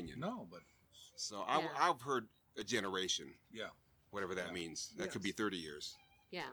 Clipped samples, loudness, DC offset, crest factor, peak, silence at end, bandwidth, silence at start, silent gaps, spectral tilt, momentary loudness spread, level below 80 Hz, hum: under 0.1%; -41 LUFS; under 0.1%; 24 dB; -18 dBFS; 0 s; over 20 kHz; 0 s; none; -3 dB/octave; 18 LU; -74 dBFS; none